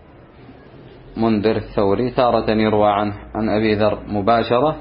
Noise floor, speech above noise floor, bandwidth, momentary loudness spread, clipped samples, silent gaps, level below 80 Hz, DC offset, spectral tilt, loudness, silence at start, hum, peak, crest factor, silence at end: -43 dBFS; 26 dB; 5.6 kHz; 6 LU; under 0.1%; none; -42 dBFS; under 0.1%; -12 dB/octave; -18 LUFS; 0.5 s; none; -2 dBFS; 16 dB; 0 s